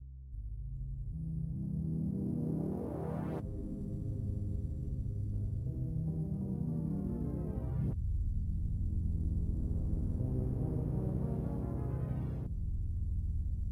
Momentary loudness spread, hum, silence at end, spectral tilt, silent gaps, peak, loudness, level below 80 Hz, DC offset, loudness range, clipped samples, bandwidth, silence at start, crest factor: 5 LU; none; 0 s; -11.5 dB/octave; none; -22 dBFS; -38 LUFS; -40 dBFS; under 0.1%; 2 LU; under 0.1%; 10.5 kHz; 0 s; 12 dB